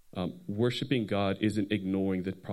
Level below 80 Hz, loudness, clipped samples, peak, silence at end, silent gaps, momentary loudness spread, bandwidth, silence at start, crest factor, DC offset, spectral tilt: -68 dBFS; -31 LUFS; under 0.1%; -14 dBFS; 0 s; none; 7 LU; 12.5 kHz; 0.1 s; 16 dB; under 0.1%; -7 dB/octave